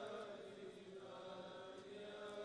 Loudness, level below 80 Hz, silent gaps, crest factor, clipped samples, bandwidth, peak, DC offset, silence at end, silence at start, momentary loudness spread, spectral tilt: -54 LUFS; -88 dBFS; none; 14 dB; under 0.1%; 11 kHz; -40 dBFS; under 0.1%; 0 s; 0 s; 4 LU; -4.5 dB/octave